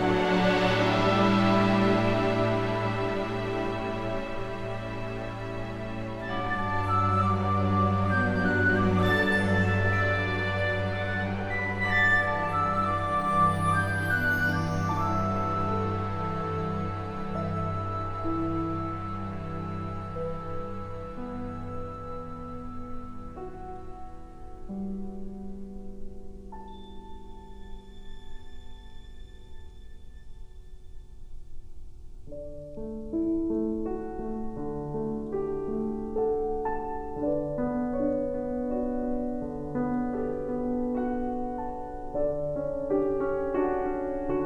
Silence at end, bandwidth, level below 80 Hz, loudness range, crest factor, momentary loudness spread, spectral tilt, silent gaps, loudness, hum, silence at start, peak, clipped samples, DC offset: 0 s; 13.5 kHz; -42 dBFS; 17 LU; 18 dB; 18 LU; -7 dB/octave; none; -28 LUFS; none; 0 s; -10 dBFS; under 0.1%; under 0.1%